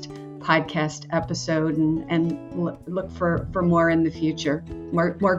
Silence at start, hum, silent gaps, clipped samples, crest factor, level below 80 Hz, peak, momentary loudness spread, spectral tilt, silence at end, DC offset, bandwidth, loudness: 0 s; none; none; under 0.1%; 18 dB; -46 dBFS; -6 dBFS; 9 LU; -6.5 dB/octave; 0 s; under 0.1%; 7.8 kHz; -24 LUFS